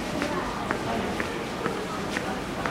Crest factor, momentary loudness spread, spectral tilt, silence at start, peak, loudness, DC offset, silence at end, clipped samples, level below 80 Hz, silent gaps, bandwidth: 24 dB; 2 LU; -4.5 dB/octave; 0 s; -6 dBFS; -29 LUFS; under 0.1%; 0 s; under 0.1%; -46 dBFS; none; 16 kHz